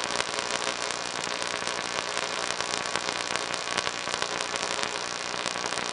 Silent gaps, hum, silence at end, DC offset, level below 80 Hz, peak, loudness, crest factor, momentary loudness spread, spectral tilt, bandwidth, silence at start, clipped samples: none; none; 0 s; under 0.1%; -62 dBFS; -4 dBFS; -29 LUFS; 28 dB; 2 LU; -1 dB/octave; 11.5 kHz; 0 s; under 0.1%